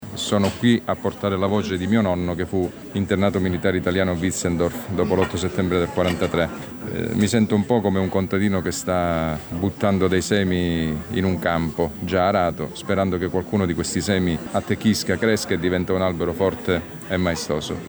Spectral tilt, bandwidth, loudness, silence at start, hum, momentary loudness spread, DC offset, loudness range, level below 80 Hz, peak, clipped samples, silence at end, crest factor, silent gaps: -5.5 dB/octave; over 20 kHz; -22 LUFS; 0 s; none; 5 LU; under 0.1%; 1 LU; -48 dBFS; -6 dBFS; under 0.1%; 0 s; 16 dB; none